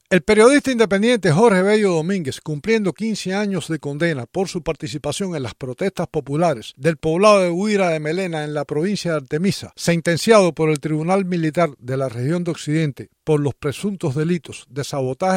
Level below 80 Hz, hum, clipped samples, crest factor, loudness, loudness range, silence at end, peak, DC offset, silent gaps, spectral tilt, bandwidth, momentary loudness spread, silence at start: -52 dBFS; none; under 0.1%; 18 dB; -19 LUFS; 5 LU; 0 s; 0 dBFS; under 0.1%; none; -5.5 dB/octave; 16 kHz; 11 LU; 0.1 s